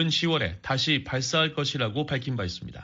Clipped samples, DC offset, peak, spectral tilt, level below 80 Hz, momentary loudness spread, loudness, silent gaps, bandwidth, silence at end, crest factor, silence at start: under 0.1%; under 0.1%; -10 dBFS; -3.5 dB/octave; -52 dBFS; 6 LU; -26 LUFS; none; 8 kHz; 0 s; 18 dB; 0 s